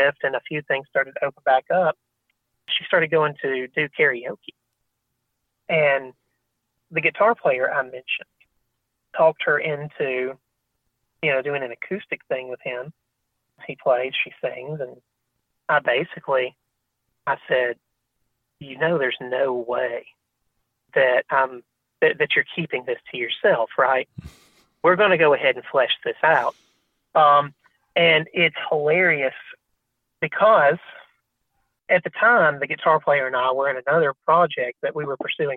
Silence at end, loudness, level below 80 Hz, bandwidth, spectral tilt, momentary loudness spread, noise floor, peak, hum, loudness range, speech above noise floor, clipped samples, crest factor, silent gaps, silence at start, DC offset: 0 s; -21 LUFS; -66 dBFS; 4.5 kHz; -7 dB/octave; 13 LU; -77 dBFS; -4 dBFS; none; 7 LU; 56 dB; under 0.1%; 20 dB; none; 0 s; under 0.1%